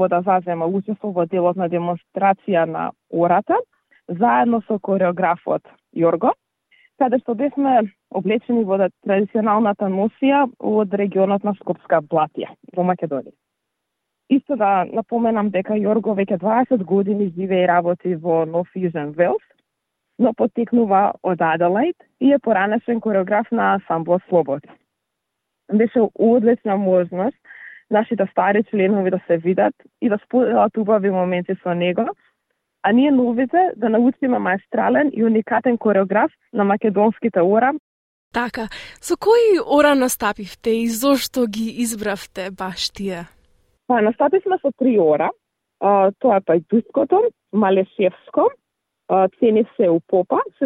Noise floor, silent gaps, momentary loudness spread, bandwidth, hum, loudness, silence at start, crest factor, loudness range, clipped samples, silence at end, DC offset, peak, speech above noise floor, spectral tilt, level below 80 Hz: -78 dBFS; 37.79-38.31 s; 8 LU; 16 kHz; none; -19 LUFS; 0 s; 18 dB; 3 LU; under 0.1%; 0 s; under 0.1%; -2 dBFS; 60 dB; -6 dB/octave; -60 dBFS